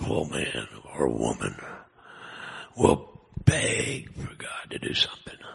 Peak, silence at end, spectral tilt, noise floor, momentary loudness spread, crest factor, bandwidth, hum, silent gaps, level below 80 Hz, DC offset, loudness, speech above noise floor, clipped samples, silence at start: -2 dBFS; 0 s; -4.5 dB/octave; -48 dBFS; 18 LU; 26 dB; 11.5 kHz; none; none; -48 dBFS; under 0.1%; -27 LUFS; 20 dB; under 0.1%; 0 s